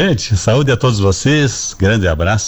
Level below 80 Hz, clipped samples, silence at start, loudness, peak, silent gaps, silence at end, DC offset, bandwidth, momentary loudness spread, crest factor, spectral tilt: -30 dBFS; under 0.1%; 0 s; -14 LUFS; -4 dBFS; none; 0 s; under 0.1%; over 20 kHz; 2 LU; 10 dB; -5 dB/octave